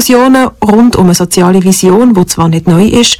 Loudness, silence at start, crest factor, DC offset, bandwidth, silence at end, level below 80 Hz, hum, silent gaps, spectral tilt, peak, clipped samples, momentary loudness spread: -6 LUFS; 0 s; 6 dB; under 0.1%; 17.5 kHz; 0.05 s; -32 dBFS; none; none; -5 dB/octave; 0 dBFS; under 0.1%; 3 LU